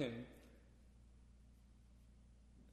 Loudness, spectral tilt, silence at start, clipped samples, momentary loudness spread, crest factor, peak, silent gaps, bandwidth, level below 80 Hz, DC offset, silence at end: -59 LUFS; -6.5 dB/octave; 0 s; under 0.1%; 14 LU; 24 dB; -28 dBFS; none; 13 kHz; -66 dBFS; under 0.1%; 0 s